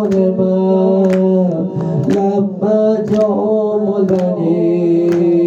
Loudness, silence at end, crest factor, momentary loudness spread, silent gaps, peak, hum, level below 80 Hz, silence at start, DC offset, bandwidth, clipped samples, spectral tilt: -14 LUFS; 0 s; 10 dB; 3 LU; none; -2 dBFS; none; -56 dBFS; 0 s; under 0.1%; 7.4 kHz; under 0.1%; -9.5 dB/octave